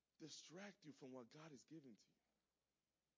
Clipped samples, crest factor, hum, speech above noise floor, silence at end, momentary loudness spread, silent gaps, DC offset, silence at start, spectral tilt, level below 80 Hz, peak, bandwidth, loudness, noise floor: under 0.1%; 18 dB; none; over 28 dB; 1.05 s; 6 LU; none; under 0.1%; 0.2 s; -4 dB/octave; under -90 dBFS; -46 dBFS; 8 kHz; -61 LUFS; under -90 dBFS